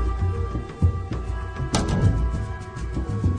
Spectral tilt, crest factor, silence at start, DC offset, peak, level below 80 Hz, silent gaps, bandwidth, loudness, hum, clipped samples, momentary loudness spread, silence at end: -6.5 dB/octave; 18 dB; 0 s; under 0.1%; -6 dBFS; -28 dBFS; none; 10 kHz; -26 LUFS; none; under 0.1%; 9 LU; 0 s